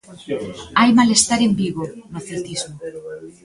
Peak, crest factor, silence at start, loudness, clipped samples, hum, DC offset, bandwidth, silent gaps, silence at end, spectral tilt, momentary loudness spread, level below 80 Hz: 0 dBFS; 18 dB; 0.1 s; -18 LUFS; under 0.1%; none; under 0.1%; 11.5 kHz; none; 0.15 s; -3.5 dB/octave; 20 LU; -52 dBFS